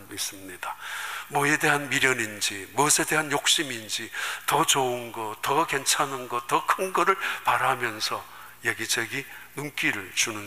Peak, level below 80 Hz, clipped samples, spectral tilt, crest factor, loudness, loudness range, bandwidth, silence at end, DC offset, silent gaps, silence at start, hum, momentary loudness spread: -6 dBFS; -64 dBFS; under 0.1%; -1.5 dB/octave; 20 dB; -25 LUFS; 3 LU; 15.5 kHz; 0 s; 0.2%; none; 0 s; none; 12 LU